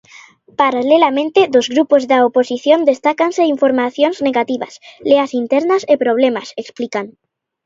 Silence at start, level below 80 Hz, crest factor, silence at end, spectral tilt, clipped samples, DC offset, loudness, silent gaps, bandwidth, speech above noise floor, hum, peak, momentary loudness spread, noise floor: 0.6 s; -64 dBFS; 14 dB; 0.55 s; -4 dB/octave; under 0.1%; under 0.1%; -14 LUFS; none; 7.8 kHz; 29 dB; none; 0 dBFS; 12 LU; -43 dBFS